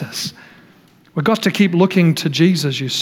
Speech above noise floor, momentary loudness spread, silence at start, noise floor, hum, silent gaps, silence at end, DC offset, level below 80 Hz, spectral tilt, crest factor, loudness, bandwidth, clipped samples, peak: 34 dB; 11 LU; 0 s; -49 dBFS; none; none; 0 s; under 0.1%; -62 dBFS; -5.5 dB/octave; 14 dB; -16 LUFS; 17 kHz; under 0.1%; -2 dBFS